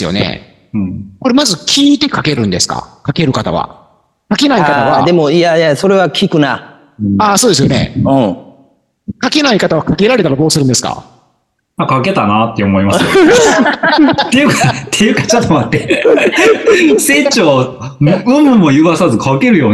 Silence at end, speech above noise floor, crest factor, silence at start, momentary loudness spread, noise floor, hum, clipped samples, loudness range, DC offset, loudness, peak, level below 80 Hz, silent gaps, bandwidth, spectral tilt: 0 s; 51 dB; 10 dB; 0 s; 11 LU; -60 dBFS; none; under 0.1%; 4 LU; under 0.1%; -10 LUFS; 0 dBFS; -42 dBFS; none; 12.5 kHz; -4.5 dB/octave